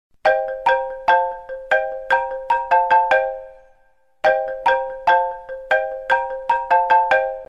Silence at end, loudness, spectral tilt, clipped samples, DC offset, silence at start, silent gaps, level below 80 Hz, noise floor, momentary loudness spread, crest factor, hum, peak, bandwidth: 0.05 s; -19 LUFS; -3 dB/octave; under 0.1%; 0.1%; 0.25 s; none; -52 dBFS; -60 dBFS; 7 LU; 14 dB; none; -4 dBFS; 8.4 kHz